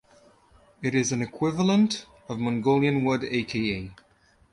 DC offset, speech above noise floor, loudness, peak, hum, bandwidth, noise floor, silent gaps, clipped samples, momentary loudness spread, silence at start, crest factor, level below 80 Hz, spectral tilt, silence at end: under 0.1%; 33 dB; -25 LUFS; -10 dBFS; none; 11.5 kHz; -58 dBFS; none; under 0.1%; 11 LU; 0.8 s; 16 dB; -56 dBFS; -5.5 dB/octave; 0.6 s